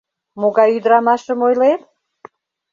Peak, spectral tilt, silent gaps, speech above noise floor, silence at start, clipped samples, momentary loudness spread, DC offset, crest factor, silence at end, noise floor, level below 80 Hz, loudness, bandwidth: -2 dBFS; -6 dB/octave; none; 30 dB; 0.35 s; under 0.1%; 6 LU; under 0.1%; 14 dB; 0.95 s; -44 dBFS; -68 dBFS; -15 LUFS; 7.4 kHz